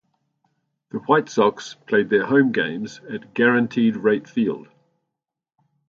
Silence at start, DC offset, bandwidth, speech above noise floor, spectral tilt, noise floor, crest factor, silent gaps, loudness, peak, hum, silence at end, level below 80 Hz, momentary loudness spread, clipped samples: 0.95 s; under 0.1%; 7.4 kHz; 64 dB; -6 dB/octave; -85 dBFS; 20 dB; none; -20 LUFS; -2 dBFS; none; 1.25 s; -68 dBFS; 14 LU; under 0.1%